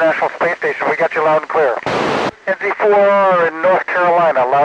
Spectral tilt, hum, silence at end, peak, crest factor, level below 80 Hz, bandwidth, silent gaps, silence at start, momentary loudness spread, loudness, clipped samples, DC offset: -5.5 dB/octave; none; 0 s; -4 dBFS; 10 dB; -58 dBFS; 9.8 kHz; none; 0 s; 6 LU; -14 LUFS; under 0.1%; under 0.1%